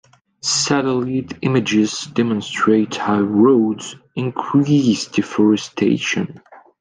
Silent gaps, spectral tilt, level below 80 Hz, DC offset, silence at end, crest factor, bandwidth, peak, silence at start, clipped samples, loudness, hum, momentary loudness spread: none; -5 dB/octave; -62 dBFS; under 0.1%; 0.25 s; 16 dB; 10 kHz; -2 dBFS; 0.45 s; under 0.1%; -18 LUFS; none; 9 LU